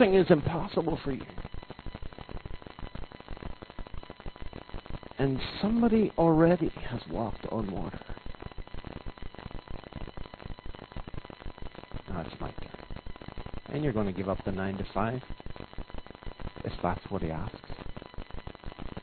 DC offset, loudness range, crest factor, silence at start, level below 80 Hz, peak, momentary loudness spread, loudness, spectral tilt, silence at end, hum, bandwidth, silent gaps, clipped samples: under 0.1%; 16 LU; 24 dB; 0 s; -44 dBFS; -8 dBFS; 20 LU; -30 LUFS; -10.5 dB/octave; 0 s; none; 4.6 kHz; none; under 0.1%